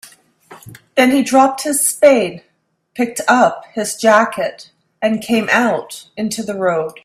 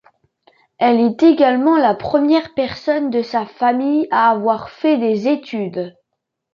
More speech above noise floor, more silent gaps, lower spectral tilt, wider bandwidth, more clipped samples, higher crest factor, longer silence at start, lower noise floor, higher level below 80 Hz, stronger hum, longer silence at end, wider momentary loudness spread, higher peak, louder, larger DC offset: second, 38 dB vs 61 dB; neither; second, -3 dB/octave vs -7 dB/octave; first, 15.5 kHz vs 6.8 kHz; neither; about the same, 16 dB vs 14 dB; second, 0.5 s vs 0.8 s; second, -52 dBFS vs -77 dBFS; about the same, -60 dBFS vs -58 dBFS; neither; second, 0.15 s vs 0.65 s; about the same, 11 LU vs 10 LU; about the same, 0 dBFS vs -2 dBFS; about the same, -15 LUFS vs -16 LUFS; neither